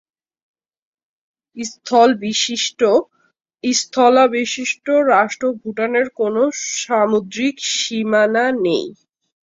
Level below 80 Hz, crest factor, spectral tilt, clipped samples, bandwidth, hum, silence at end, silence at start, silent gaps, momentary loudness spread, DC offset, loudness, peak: -66 dBFS; 16 dB; -2.5 dB/octave; under 0.1%; 7.8 kHz; none; 0.5 s; 1.55 s; none; 9 LU; under 0.1%; -17 LUFS; -2 dBFS